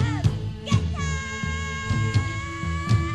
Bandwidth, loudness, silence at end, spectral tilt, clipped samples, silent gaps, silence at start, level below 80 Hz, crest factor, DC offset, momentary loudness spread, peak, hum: 9.8 kHz; -26 LUFS; 0 s; -5.5 dB/octave; under 0.1%; none; 0 s; -34 dBFS; 18 dB; 0.3%; 5 LU; -6 dBFS; none